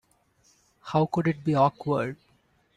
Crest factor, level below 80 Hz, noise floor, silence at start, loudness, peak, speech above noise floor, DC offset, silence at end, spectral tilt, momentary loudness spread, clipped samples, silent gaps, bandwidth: 18 dB; -62 dBFS; -66 dBFS; 0.85 s; -26 LUFS; -10 dBFS; 41 dB; under 0.1%; 0.65 s; -8 dB/octave; 16 LU; under 0.1%; none; 9.8 kHz